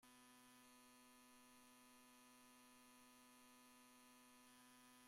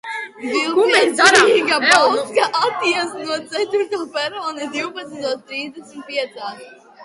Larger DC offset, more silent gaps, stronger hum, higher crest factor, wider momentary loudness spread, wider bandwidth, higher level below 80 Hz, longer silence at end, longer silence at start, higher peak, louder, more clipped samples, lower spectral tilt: neither; neither; neither; second, 12 dB vs 18 dB; second, 1 LU vs 16 LU; first, 16 kHz vs 11.5 kHz; second, under -90 dBFS vs -64 dBFS; about the same, 0 s vs 0 s; about the same, 0 s vs 0.05 s; second, -56 dBFS vs 0 dBFS; second, -68 LUFS vs -17 LUFS; neither; about the same, -1.5 dB/octave vs -1.5 dB/octave